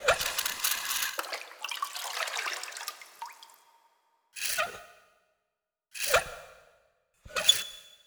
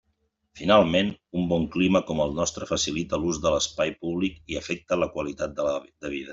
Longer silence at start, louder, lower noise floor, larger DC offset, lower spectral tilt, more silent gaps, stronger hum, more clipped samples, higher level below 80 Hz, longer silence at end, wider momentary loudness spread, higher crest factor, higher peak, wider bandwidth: second, 0 s vs 0.55 s; second, -30 LUFS vs -26 LUFS; first, -85 dBFS vs -73 dBFS; neither; second, 1 dB/octave vs -4.5 dB/octave; neither; neither; neither; second, -60 dBFS vs -50 dBFS; about the same, 0.1 s vs 0 s; first, 20 LU vs 11 LU; first, 28 dB vs 22 dB; about the same, -6 dBFS vs -4 dBFS; first, over 20 kHz vs 7.8 kHz